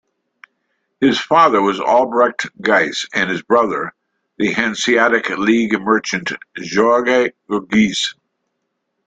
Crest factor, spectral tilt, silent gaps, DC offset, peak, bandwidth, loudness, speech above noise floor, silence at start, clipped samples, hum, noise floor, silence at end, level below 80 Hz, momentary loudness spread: 16 dB; -4 dB/octave; none; under 0.1%; 0 dBFS; 9.2 kHz; -16 LUFS; 57 dB; 1 s; under 0.1%; none; -73 dBFS; 0.95 s; -58 dBFS; 8 LU